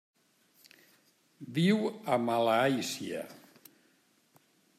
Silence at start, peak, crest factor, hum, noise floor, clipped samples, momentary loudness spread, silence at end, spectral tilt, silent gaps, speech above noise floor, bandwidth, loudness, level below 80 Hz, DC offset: 1.4 s; -16 dBFS; 18 dB; none; -69 dBFS; under 0.1%; 14 LU; 1.45 s; -5.5 dB/octave; none; 39 dB; 15 kHz; -30 LUFS; -82 dBFS; under 0.1%